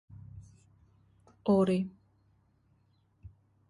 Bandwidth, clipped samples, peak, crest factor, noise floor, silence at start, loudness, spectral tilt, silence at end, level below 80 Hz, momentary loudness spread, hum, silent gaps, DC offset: 11 kHz; under 0.1%; -16 dBFS; 20 dB; -70 dBFS; 0.1 s; -30 LUFS; -8.5 dB/octave; 1.8 s; -64 dBFS; 25 LU; none; none; under 0.1%